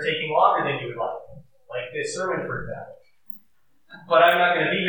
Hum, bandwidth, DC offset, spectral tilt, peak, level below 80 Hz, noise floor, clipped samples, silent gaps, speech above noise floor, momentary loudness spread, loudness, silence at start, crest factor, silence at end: none; 19 kHz; under 0.1%; -4 dB/octave; -4 dBFS; -60 dBFS; -68 dBFS; under 0.1%; none; 46 dB; 22 LU; -22 LUFS; 0 s; 20 dB; 0 s